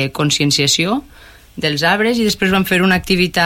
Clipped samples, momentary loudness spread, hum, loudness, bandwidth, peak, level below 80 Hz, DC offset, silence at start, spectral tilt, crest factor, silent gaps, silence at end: under 0.1%; 7 LU; none; -14 LUFS; 17 kHz; -2 dBFS; -40 dBFS; under 0.1%; 0 s; -4 dB/octave; 12 dB; none; 0 s